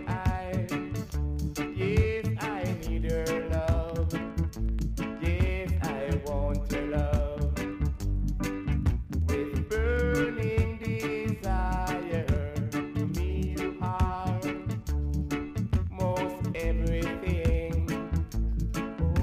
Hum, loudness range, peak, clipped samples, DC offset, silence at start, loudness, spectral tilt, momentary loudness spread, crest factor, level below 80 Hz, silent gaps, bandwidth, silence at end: none; 2 LU; -12 dBFS; under 0.1%; under 0.1%; 0 s; -30 LUFS; -7 dB/octave; 4 LU; 16 dB; -32 dBFS; none; 15.5 kHz; 0 s